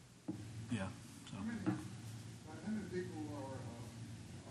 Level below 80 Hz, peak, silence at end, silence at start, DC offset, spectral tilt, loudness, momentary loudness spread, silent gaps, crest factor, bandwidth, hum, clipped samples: -70 dBFS; -24 dBFS; 0 s; 0 s; under 0.1%; -6 dB/octave; -46 LUFS; 10 LU; none; 22 dB; 13 kHz; none; under 0.1%